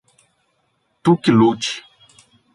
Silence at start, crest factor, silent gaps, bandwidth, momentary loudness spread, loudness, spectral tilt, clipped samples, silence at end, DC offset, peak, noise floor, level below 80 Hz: 1.05 s; 18 dB; none; 11.5 kHz; 11 LU; -17 LUFS; -6 dB/octave; under 0.1%; 0.75 s; under 0.1%; -2 dBFS; -67 dBFS; -60 dBFS